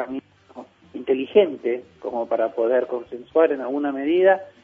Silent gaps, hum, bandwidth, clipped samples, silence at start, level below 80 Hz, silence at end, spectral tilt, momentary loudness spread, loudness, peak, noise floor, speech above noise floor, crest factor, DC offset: none; none; 4.4 kHz; under 0.1%; 0 s; -68 dBFS; 0.15 s; -7.5 dB/octave; 13 LU; -22 LUFS; -4 dBFS; -43 dBFS; 22 dB; 18 dB; under 0.1%